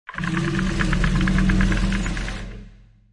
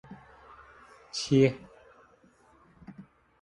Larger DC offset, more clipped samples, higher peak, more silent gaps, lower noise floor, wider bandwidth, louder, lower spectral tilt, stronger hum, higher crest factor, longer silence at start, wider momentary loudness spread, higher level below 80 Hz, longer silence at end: neither; neither; first, -6 dBFS vs -10 dBFS; neither; second, -46 dBFS vs -61 dBFS; about the same, 11 kHz vs 10.5 kHz; first, -22 LUFS vs -27 LUFS; about the same, -6 dB/octave vs -6 dB/octave; neither; second, 16 dB vs 22 dB; about the same, 0.1 s vs 0.1 s; second, 13 LU vs 28 LU; first, -26 dBFS vs -64 dBFS; about the same, 0.4 s vs 0.4 s